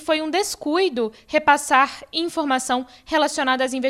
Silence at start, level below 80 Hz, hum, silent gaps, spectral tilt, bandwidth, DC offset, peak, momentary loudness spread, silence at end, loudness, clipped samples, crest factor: 0 s; -58 dBFS; none; none; -1.5 dB/octave; 16 kHz; under 0.1%; -2 dBFS; 7 LU; 0 s; -21 LUFS; under 0.1%; 18 dB